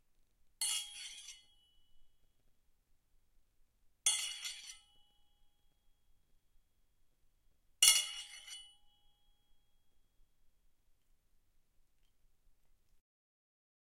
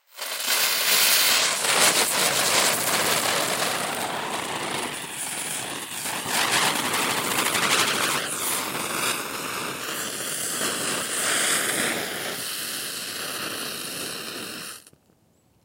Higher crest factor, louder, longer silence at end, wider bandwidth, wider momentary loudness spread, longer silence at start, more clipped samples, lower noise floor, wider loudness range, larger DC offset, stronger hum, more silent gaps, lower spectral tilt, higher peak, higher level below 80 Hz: first, 36 dB vs 22 dB; second, -32 LUFS vs -23 LUFS; first, 5.3 s vs 0.85 s; about the same, 16 kHz vs 16 kHz; first, 24 LU vs 12 LU; first, 0.6 s vs 0.15 s; neither; first, -72 dBFS vs -62 dBFS; first, 17 LU vs 8 LU; neither; neither; neither; second, 5 dB/octave vs -0.5 dB/octave; second, -8 dBFS vs -2 dBFS; second, -74 dBFS vs -66 dBFS